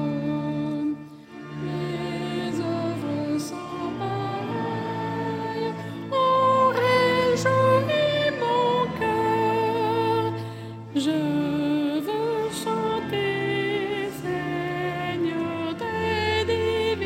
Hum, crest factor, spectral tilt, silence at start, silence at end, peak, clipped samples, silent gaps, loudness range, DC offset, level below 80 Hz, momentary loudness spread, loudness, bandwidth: none; 16 dB; -6 dB/octave; 0 s; 0 s; -8 dBFS; under 0.1%; none; 8 LU; under 0.1%; -60 dBFS; 10 LU; -25 LUFS; 16 kHz